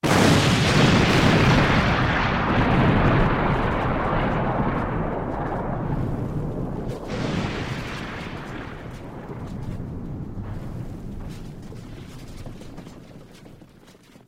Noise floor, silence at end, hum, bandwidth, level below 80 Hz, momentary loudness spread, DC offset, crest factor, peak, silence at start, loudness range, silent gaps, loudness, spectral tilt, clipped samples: -50 dBFS; 0.65 s; none; 16 kHz; -34 dBFS; 22 LU; under 0.1%; 18 dB; -4 dBFS; 0.05 s; 18 LU; none; -22 LUFS; -5.5 dB/octave; under 0.1%